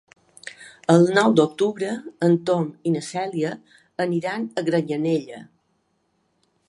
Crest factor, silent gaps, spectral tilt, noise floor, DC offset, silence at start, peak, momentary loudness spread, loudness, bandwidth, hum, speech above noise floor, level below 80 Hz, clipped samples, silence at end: 22 dB; none; -6.5 dB/octave; -69 dBFS; under 0.1%; 0.45 s; -2 dBFS; 22 LU; -22 LUFS; 11.5 kHz; none; 48 dB; -70 dBFS; under 0.1%; 1.25 s